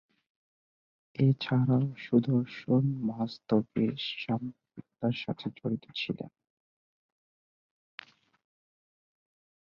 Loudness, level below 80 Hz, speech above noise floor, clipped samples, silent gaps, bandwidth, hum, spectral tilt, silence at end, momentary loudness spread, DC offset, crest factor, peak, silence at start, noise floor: -30 LUFS; -70 dBFS; over 61 dB; under 0.1%; none; 6.6 kHz; none; -9 dB/octave; 3.45 s; 17 LU; under 0.1%; 20 dB; -12 dBFS; 1.2 s; under -90 dBFS